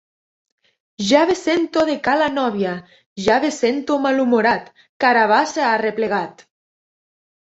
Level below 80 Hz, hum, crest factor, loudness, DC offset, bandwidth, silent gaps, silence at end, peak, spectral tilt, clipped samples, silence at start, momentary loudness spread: -58 dBFS; none; 18 dB; -18 LUFS; under 0.1%; 8.2 kHz; 3.06-3.16 s, 4.89-5.00 s; 1.1 s; -2 dBFS; -4 dB/octave; under 0.1%; 1 s; 9 LU